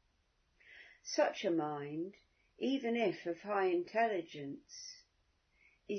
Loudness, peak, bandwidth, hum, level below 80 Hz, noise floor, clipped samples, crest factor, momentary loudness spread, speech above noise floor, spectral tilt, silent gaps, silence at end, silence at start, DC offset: -37 LUFS; -20 dBFS; 6.4 kHz; none; -80 dBFS; -77 dBFS; under 0.1%; 20 dB; 17 LU; 40 dB; -3.5 dB/octave; none; 0 s; 0.7 s; under 0.1%